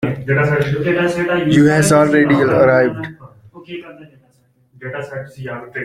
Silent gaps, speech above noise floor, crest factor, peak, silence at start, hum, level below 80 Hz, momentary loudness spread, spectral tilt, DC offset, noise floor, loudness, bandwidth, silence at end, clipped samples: none; 41 dB; 14 dB; -2 dBFS; 0 s; none; -48 dBFS; 20 LU; -6 dB/octave; under 0.1%; -56 dBFS; -14 LUFS; 15 kHz; 0 s; under 0.1%